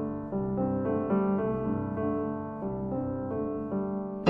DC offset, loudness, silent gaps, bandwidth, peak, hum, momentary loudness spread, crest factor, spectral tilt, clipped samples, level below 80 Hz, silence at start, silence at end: under 0.1%; -31 LUFS; none; 3.2 kHz; -8 dBFS; none; 6 LU; 22 dB; -10 dB/octave; under 0.1%; -52 dBFS; 0 s; 0 s